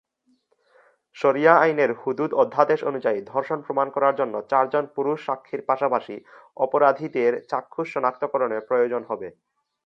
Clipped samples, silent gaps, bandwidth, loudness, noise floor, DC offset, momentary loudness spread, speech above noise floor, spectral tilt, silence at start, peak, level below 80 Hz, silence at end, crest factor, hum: under 0.1%; none; 7.2 kHz; -23 LUFS; -66 dBFS; under 0.1%; 10 LU; 44 dB; -7 dB/octave; 1.15 s; -2 dBFS; -76 dBFS; 0.55 s; 22 dB; none